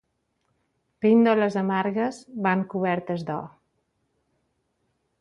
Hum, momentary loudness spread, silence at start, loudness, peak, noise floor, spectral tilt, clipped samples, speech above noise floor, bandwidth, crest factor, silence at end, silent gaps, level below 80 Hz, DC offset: none; 12 LU; 1 s; -24 LUFS; -8 dBFS; -74 dBFS; -7.5 dB/octave; under 0.1%; 51 dB; 9.4 kHz; 18 dB; 1.7 s; none; -70 dBFS; under 0.1%